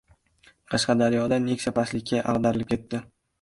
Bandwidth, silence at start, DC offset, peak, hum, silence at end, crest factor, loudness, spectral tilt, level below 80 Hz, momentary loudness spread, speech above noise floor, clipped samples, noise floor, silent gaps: 11.5 kHz; 0.7 s; under 0.1%; -8 dBFS; none; 0.4 s; 16 dB; -25 LUFS; -5.5 dB/octave; -54 dBFS; 8 LU; 36 dB; under 0.1%; -60 dBFS; none